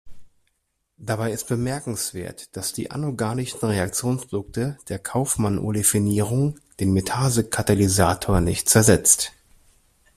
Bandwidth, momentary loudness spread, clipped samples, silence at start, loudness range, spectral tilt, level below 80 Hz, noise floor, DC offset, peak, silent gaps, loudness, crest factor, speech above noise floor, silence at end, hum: 16 kHz; 12 LU; under 0.1%; 0.05 s; 8 LU; -4.5 dB/octave; -44 dBFS; -74 dBFS; under 0.1%; 0 dBFS; none; -22 LUFS; 22 dB; 52 dB; 0.85 s; none